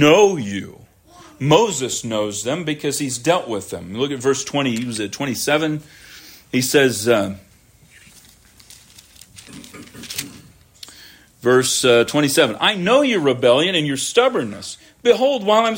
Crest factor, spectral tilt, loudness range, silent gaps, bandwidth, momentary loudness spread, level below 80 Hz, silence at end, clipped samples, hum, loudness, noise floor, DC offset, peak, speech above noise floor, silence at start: 18 dB; -3.5 dB/octave; 15 LU; none; 16.5 kHz; 22 LU; -58 dBFS; 0 s; under 0.1%; none; -18 LUFS; -51 dBFS; under 0.1%; -2 dBFS; 33 dB; 0 s